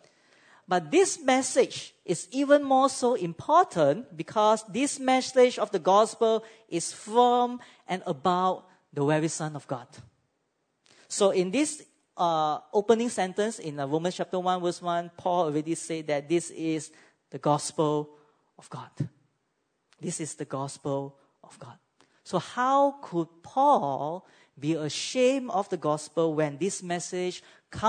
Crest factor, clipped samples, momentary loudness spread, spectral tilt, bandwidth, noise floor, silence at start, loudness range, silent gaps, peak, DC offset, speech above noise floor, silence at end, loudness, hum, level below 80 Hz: 20 dB; under 0.1%; 13 LU; -4.5 dB/octave; 9.6 kHz; -76 dBFS; 0.7 s; 8 LU; none; -8 dBFS; under 0.1%; 50 dB; 0 s; -27 LUFS; none; -72 dBFS